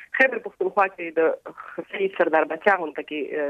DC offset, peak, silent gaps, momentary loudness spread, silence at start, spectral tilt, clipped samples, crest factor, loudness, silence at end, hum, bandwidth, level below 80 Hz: under 0.1%; -4 dBFS; none; 13 LU; 0 s; -6 dB/octave; under 0.1%; 20 dB; -23 LUFS; 0 s; none; 8.4 kHz; -72 dBFS